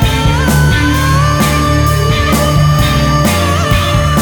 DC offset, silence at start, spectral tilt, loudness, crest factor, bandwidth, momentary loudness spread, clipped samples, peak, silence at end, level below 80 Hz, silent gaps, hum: under 0.1%; 0 s; -5 dB/octave; -11 LUFS; 10 dB; over 20 kHz; 1 LU; under 0.1%; 0 dBFS; 0 s; -18 dBFS; none; none